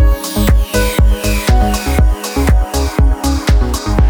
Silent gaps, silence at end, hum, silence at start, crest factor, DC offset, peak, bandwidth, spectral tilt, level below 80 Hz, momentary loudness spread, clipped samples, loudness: none; 0 s; none; 0 s; 10 dB; under 0.1%; 0 dBFS; over 20 kHz; -5.5 dB/octave; -12 dBFS; 2 LU; under 0.1%; -14 LUFS